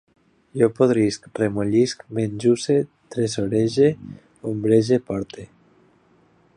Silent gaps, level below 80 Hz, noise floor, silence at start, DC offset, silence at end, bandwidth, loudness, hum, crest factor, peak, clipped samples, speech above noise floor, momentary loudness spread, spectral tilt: none; -56 dBFS; -58 dBFS; 0.55 s; under 0.1%; 1.1 s; 11 kHz; -21 LUFS; none; 18 dB; -4 dBFS; under 0.1%; 37 dB; 15 LU; -6.5 dB/octave